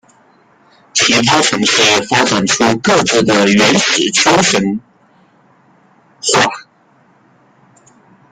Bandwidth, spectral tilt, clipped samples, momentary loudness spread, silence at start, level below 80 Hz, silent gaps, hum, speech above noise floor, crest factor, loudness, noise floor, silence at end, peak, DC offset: 15 kHz; -2.5 dB/octave; under 0.1%; 7 LU; 0.95 s; -50 dBFS; none; none; 40 dB; 14 dB; -11 LUFS; -51 dBFS; 1.7 s; 0 dBFS; under 0.1%